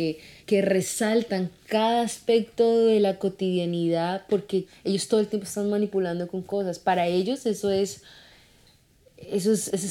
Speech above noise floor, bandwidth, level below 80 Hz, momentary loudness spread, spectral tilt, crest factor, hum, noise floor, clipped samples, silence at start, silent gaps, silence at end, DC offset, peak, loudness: 34 dB; 16.5 kHz; -64 dBFS; 8 LU; -5 dB/octave; 16 dB; none; -59 dBFS; under 0.1%; 0 s; none; 0 s; under 0.1%; -8 dBFS; -25 LUFS